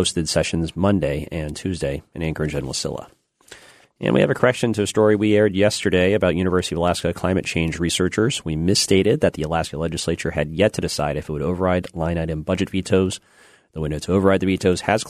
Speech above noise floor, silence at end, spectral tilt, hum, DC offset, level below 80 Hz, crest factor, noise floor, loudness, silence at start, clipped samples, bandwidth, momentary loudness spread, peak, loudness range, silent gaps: 27 dB; 0 s; -5 dB/octave; none; under 0.1%; -40 dBFS; 20 dB; -47 dBFS; -21 LUFS; 0 s; under 0.1%; 13.5 kHz; 9 LU; -2 dBFS; 5 LU; none